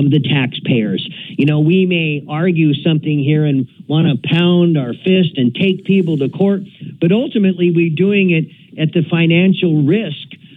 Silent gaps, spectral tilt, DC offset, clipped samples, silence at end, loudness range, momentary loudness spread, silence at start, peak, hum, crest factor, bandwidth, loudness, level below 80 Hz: none; -9.5 dB/octave; under 0.1%; under 0.1%; 0.2 s; 1 LU; 7 LU; 0 s; -2 dBFS; none; 12 dB; 4 kHz; -14 LUFS; -68 dBFS